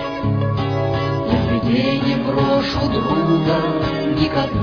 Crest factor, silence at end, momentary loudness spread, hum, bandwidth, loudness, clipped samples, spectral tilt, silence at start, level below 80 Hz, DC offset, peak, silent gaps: 16 dB; 0 s; 3 LU; none; 5.4 kHz; -18 LUFS; under 0.1%; -8 dB/octave; 0 s; -36 dBFS; under 0.1%; -2 dBFS; none